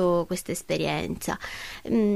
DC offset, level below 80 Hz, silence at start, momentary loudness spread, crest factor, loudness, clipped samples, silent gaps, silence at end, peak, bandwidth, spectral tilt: under 0.1%; -50 dBFS; 0 s; 9 LU; 14 dB; -29 LUFS; under 0.1%; none; 0 s; -14 dBFS; 15.5 kHz; -5 dB/octave